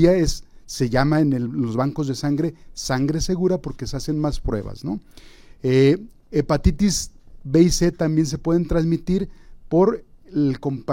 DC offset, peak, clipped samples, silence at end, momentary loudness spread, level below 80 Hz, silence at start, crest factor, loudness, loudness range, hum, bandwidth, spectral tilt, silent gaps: under 0.1%; -4 dBFS; under 0.1%; 0 s; 13 LU; -34 dBFS; 0 s; 18 dB; -21 LUFS; 4 LU; none; 16.5 kHz; -6 dB/octave; none